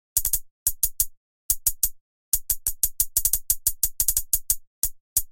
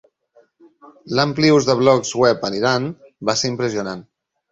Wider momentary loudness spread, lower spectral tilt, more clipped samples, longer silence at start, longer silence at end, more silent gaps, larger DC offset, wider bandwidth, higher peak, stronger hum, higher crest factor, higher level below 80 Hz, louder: second, 5 LU vs 12 LU; second, 1 dB/octave vs -4.5 dB/octave; neither; second, 0.15 s vs 1.05 s; second, 0 s vs 0.5 s; first, 0.51-0.66 s, 1.17-1.49 s, 2.01-2.32 s, 4.67-4.82 s, 5.00-5.16 s vs none; first, 0.6% vs under 0.1%; first, 17 kHz vs 8.2 kHz; about the same, -2 dBFS vs -2 dBFS; neither; first, 24 dB vs 18 dB; first, -40 dBFS vs -56 dBFS; second, -23 LUFS vs -18 LUFS